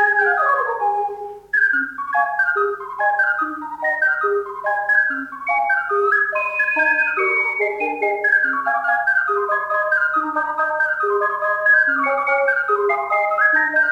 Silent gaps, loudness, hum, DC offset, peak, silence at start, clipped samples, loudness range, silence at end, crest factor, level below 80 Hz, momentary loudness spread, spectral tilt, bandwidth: none; -18 LUFS; none; under 0.1%; -4 dBFS; 0 s; under 0.1%; 2 LU; 0 s; 14 dB; -64 dBFS; 6 LU; -4 dB/octave; 10.5 kHz